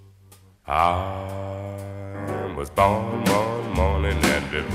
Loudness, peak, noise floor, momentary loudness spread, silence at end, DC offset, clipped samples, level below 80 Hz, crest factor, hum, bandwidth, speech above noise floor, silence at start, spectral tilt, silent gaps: -24 LUFS; -4 dBFS; -52 dBFS; 12 LU; 0 s; under 0.1%; under 0.1%; -36 dBFS; 20 dB; none; 16 kHz; 30 dB; 0 s; -5.5 dB/octave; none